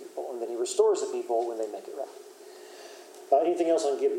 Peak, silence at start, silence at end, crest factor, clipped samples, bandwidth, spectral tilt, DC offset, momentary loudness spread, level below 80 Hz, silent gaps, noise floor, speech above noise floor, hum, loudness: -10 dBFS; 0 s; 0 s; 18 dB; under 0.1%; 16 kHz; -2.5 dB/octave; under 0.1%; 22 LU; under -90 dBFS; none; -48 dBFS; 21 dB; none; -28 LUFS